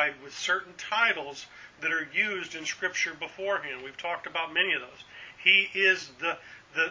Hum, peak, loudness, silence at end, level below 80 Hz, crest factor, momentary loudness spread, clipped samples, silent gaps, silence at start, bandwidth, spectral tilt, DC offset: none; -6 dBFS; -27 LUFS; 0 s; -72 dBFS; 24 dB; 17 LU; under 0.1%; none; 0 s; 7.6 kHz; -1 dB/octave; under 0.1%